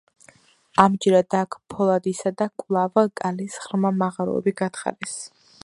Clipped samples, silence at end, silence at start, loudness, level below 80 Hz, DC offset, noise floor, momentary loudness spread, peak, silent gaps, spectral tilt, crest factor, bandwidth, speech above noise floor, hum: under 0.1%; 0.4 s; 0.8 s; -23 LUFS; -64 dBFS; under 0.1%; -55 dBFS; 12 LU; 0 dBFS; none; -6 dB/octave; 22 dB; 11.5 kHz; 33 dB; none